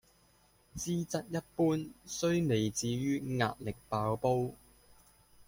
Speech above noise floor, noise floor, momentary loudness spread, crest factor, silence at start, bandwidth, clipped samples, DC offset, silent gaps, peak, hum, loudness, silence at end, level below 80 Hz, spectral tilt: 34 dB; -67 dBFS; 9 LU; 20 dB; 0.75 s; 16.5 kHz; under 0.1%; under 0.1%; none; -16 dBFS; none; -34 LUFS; 0.95 s; -60 dBFS; -5.5 dB/octave